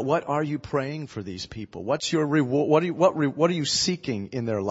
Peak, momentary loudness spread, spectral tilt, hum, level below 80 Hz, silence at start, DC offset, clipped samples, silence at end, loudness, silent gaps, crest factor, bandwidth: -6 dBFS; 13 LU; -5 dB/octave; none; -58 dBFS; 0 s; under 0.1%; under 0.1%; 0 s; -25 LUFS; none; 18 dB; 8 kHz